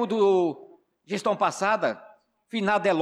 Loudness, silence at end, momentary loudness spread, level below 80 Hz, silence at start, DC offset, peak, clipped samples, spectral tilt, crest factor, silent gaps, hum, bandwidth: -25 LUFS; 0 s; 12 LU; -74 dBFS; 0 s; under 0.1%; -12 dBFS; under 0.1%; -5 dB/octave; 14 dB; none; none; 11.5 kHz